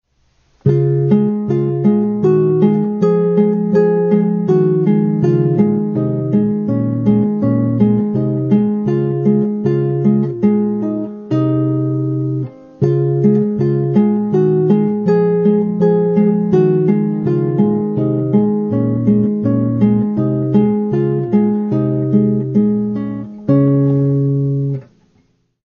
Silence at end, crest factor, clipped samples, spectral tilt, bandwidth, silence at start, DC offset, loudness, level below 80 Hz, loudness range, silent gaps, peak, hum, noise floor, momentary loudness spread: 0.8 s; 12 dB; under 0.1%; -11 dB/octave; 4.8 kHz; 0.65 s; under 0.1%; -15 LUFS; -52 dBFS; 2 LU; none; -2 dBFS; none; -58 dBFS; 5 LU